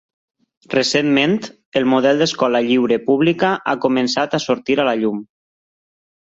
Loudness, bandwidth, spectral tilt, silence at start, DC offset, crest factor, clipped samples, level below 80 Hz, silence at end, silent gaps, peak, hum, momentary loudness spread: -17 LUFS; 7.8 kHz; -4.5 dB/octave; 0.7 s; under 0.1%; 16 dB; under 0.1%; -60 dBFS; 1.15 s; 1.66-1.72 s; -2 dBFS; none; 6 LU